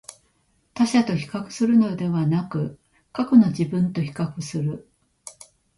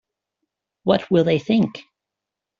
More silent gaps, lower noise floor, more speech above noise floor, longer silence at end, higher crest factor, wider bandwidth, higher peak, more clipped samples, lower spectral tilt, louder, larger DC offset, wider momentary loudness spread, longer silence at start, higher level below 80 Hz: neither; second, -66 dBFS vs -85 dBFS; second, 44 dB vs 67 dB; second, 0.45 s vs 0.8 s; about the same, 18 dB vs 20 dB; first, 11.5 kHz vs 7.4 kHz; about the same, -4 dBFS vs -4 dBFS; neither; about the same, -7 dB/octave vs -6 dB/octave; about the same, -22 LUFS vs -20 LUFS; neither; first, 24 LU vs 9 LU; second, 0.1 s vs 0.85 s; about the same, -60 dBFS vs -60 dBFS